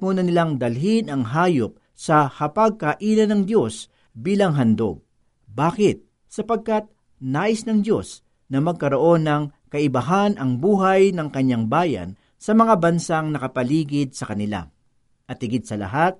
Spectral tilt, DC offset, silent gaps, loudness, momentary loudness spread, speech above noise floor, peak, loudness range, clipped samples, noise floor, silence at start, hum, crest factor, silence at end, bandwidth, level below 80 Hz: -6.5 dB/octave; under 0.1%; none; -21 LUFS; 13 LU; 43 dB; -4 dBFS; 4 LU; under 0.1%; -63 dBFS; 0 s; none; 16 dB; 0.05 s; 11.5 kHz; -56 dBFS